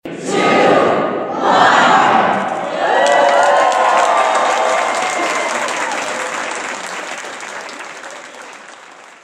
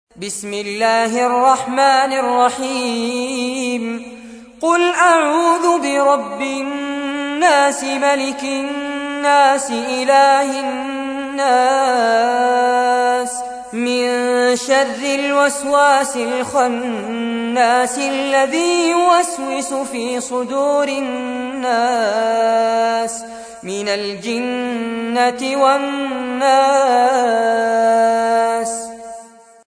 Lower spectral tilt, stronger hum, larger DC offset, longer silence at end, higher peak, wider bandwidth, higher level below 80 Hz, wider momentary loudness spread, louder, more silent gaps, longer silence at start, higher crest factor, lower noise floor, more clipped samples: about the same, -3 dB/octave vs -2.5 dB/octave; neither; neither; second, 0.15 s vs 0.4 s; about the same, 0 dBFS vs -2 dBFS; first, 14.5 kHz vs 11 kHz; second, -66 dBFS vs -60 dBFS; first, 18 LU vs 10 LU; about the same, -14 LUFS vs -16 LUFS; neither; about the same, 0.05 s vs 0.15 s; about the same, 14 dB vs 14 dB; about the same, -38 dBFS vs -40 dBFS; neither